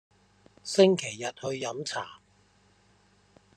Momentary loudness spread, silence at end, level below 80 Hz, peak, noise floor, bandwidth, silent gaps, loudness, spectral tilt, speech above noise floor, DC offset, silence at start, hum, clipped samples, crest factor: 17 LU; 1.45 s; -72 dBFS; -8 dBFS; -64 dBFS; 10.5 kHz; none; -28 LUFS; -4.5 dB/octave; 37 dB; under 0.1%; 0.65 s; none; under 0.1%; 24 dB